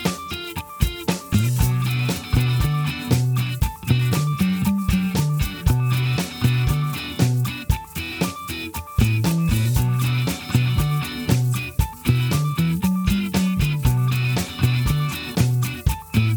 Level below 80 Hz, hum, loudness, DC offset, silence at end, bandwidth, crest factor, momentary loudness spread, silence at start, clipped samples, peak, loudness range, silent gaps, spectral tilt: -32 dBFS; none; -22 LUFS; under 0.1%; 0 s; over 20 kHz; 18 dB; 6 LU; 0 s; under 0.1%; -4 dBFS; 2 LU; none; -5.5 dB/octave